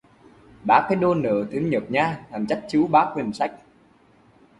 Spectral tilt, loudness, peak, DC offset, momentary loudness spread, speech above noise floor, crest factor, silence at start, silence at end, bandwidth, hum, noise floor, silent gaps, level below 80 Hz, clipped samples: -7 dB/octave; -22 LUFS; -4 dBFS; under 0.1%; 9 LU; 34 dB; 20 dB; 0.65 s; 1.05 s; 11.5 kHz; none; -56 dBFS; none; -58 dBFS; under 0.1%